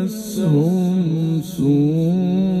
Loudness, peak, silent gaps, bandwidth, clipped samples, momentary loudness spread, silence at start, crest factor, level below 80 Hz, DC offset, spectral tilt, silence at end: -18 LUFS; -6 dBFS; none; 15 kHz; under 0.1%; 5 LU; 0 s; 10 dB; -52 dBFS; under 0.1%; -8 dB/octave; 0 s